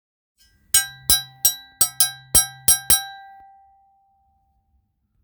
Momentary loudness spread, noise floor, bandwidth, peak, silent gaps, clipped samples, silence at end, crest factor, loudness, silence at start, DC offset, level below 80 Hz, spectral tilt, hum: 5 LU; -67 dBFS; over 20 kHz; 0 dBFS; none; under 0.1%; 2.05 s; 24 dB; -17 LUFS; 0.75 s; under 0.1%; -46 dBFS; 0.5 dB/octave; none